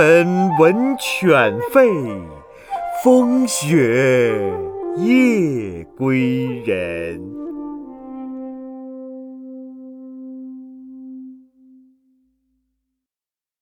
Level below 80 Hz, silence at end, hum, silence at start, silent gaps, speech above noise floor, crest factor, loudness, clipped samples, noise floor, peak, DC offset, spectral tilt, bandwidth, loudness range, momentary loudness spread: -56 dBFS; 2.25 s; none; 0 s; none; over 74 dB; 18 dB; -16 LUFS; under 0.1%; under -90 dBFS; 0 dBFS; under 0.1%; -5.5 dB/octave; over 20 kHz; 21 LU; 22 LU